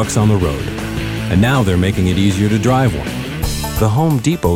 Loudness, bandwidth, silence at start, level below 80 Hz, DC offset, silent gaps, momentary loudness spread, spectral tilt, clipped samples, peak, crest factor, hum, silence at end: -16 LUFS; 16.5 kHz; 0 s; -28 dBFS; under 0.1%; none; 8 LU; -6 dB/octave; under 0.1%; -2 dBFS; 14 dB; none; 0 s